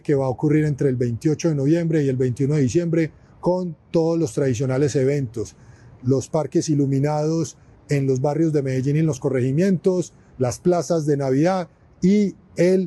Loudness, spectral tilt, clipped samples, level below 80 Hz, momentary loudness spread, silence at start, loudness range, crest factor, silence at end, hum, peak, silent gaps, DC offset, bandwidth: -21 LUFS; -7.5 dB/octave; under 0.1%; -54 dBFS; 6 LU; 0.1 s; 2 LU; 14 dB; 0 s; none; -8 dBFS; none; under 0.1%; 12 kHz